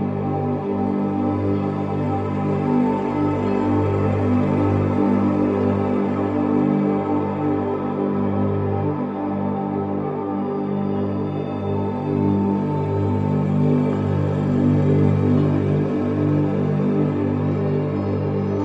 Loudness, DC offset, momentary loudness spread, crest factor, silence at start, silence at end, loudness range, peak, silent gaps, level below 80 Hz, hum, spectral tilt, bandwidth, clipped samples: -21 LUFS; under 0.1%; 5 LU; 16 dB; 0 s; 0 s; 4 LU; -4 dBFS; none; -54 dBFS; 50 Hz at -35 dBFS; -10.5 dB/octave; 7.2 kHz; under 0.1%